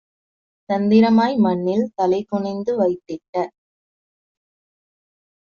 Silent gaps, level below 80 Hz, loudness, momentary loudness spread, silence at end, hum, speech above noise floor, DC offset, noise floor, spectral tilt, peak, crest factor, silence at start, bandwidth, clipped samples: 3.29-3.33 s; -64 dBFS; -19 LUFS; 12 LU; 1.95 s; none; over 72 dB; under 0.1%; under -90 dBFS; -6.5 dB/octave; -4 dBFS; 18 dB; 0.7 s; 7 kHz; under 0.1%